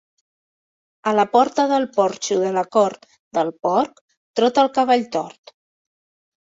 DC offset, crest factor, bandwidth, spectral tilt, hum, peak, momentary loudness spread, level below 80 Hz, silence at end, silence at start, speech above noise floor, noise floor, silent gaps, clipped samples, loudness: under 0.1%; 18 dB; 8 kHz; -4.5 dB/octave; none; -2 dBFS; 10 LU; -68 dBFS; 1.3 s; 1.05 s; over 71 dB; under -90 dBFS; 3.19-3.31 s, 4.01-4.09 s, 4.17-4.34 s; under 0.1%; -20 LUFS